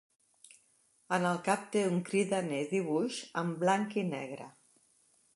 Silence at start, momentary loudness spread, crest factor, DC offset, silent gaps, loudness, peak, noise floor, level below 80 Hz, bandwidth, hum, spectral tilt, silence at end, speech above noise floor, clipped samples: 1.1 s; 8 LU; 20 dB; under 0.1%; none; -33 LUFS; -14 dBFS; -70 dBFS; -82 dBFS; 11.5 kHz; none; -5.5 dB/octave; 0.85 s; 38 dB; under 0.1%